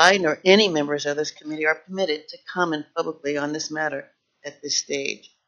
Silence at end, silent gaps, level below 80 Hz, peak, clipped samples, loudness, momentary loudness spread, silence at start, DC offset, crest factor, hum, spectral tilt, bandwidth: 0.3 s; none; -72 dBFS; 0 dBFS; under 0.1%; -23 LUFS; 14 LU; 0 s; under 0.1%; 22 dB; none; -1.5 dB/octave; 7.6 kHz